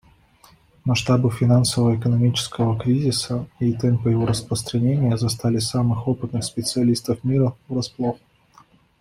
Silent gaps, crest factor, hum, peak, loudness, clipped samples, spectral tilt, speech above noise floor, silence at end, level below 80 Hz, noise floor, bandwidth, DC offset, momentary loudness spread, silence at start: none; 14 dB; none; -6 dBFS; -21 LUFS; under 0.1%; -6 dB/octave; 34 dB; 0.85 s; -50 dBFS; -54 dBFS; 15 kHz; under 0.1%; 7 LU; 0.85 s